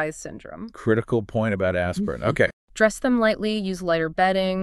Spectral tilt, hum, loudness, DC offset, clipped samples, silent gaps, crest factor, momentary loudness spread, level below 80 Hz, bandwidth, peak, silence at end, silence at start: -5.5 dB/octave; none; -23 LUFS; under 0.1%; under 0.1%; 2.53-2.68 s; 18 dB; 9 LU; -48 dBFS; 13 kHz; -6 dBFS; 0 s; 0 s